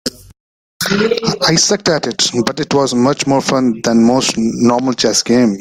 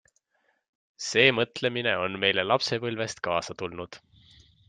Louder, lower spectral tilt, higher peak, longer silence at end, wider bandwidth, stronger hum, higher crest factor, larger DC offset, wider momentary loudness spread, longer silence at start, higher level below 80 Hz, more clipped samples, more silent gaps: first, -13 LUFS vs -26 LUFS; about the same, -3.5 dB/octave vs -3.5 dB/octave; first, 0 dBFS vs -4 dBFS; second, 0 s vs 0.7 s; first, 16.5 kHz vs 9.6 kHz; neither; second, 14 dB vs 26 dB; neither; second, 4 LU vs 15 LU; second, 0.05 s vs 1 s; first, -48 dBFS vs -66 dBFS; neither; first, 0.40-0.80 s vs none